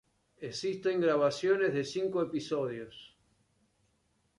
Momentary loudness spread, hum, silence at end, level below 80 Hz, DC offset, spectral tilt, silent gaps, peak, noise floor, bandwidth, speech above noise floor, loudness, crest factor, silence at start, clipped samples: 16 LU; none; 1.3 s; -72 dBFS; under 0.1%; -5.5 dB/octave; none; -16 dBFS; -74 dBFS; 11 kHz; 43 dB; -31 LUFS; 16 dB; 0.4 s; under 0.1%